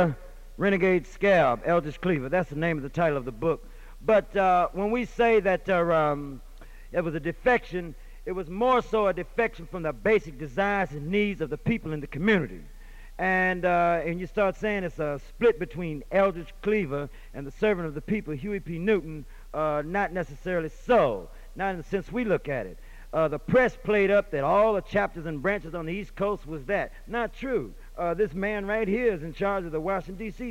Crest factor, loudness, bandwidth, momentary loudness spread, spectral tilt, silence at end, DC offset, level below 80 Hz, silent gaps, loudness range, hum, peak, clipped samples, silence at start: 14 dB; -27 LUFS; 16 kHz; 12 LU; -7 dB/octave; 0 s; under 0.1%; -44 dBFS; none; 4 LU; none; -12 dBFS; under 0.1%; 0 s